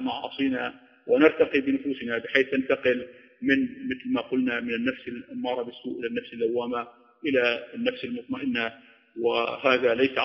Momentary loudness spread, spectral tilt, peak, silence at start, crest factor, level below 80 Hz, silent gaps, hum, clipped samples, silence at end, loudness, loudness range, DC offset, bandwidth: 12 LU; -2 dB/octave; -4 dBFS; 0 s; 22 dB; -66 dBFS; none; none; under 0.1%; 0 s; -26 LUFS; 5 LU; under 0.1%; 6.4 kHz